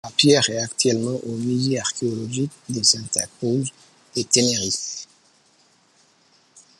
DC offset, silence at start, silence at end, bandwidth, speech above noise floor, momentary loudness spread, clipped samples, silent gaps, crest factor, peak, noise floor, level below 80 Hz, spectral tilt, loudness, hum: under 0.1%; 0.05 s; 1.75 s; 13 kHz; 37 dB; 11 LU; under 0.1%; none; 24 dB; 0 dBFS; -59 dBFS; -66 dBFS; -3 dB/octave; -21 LUFS; none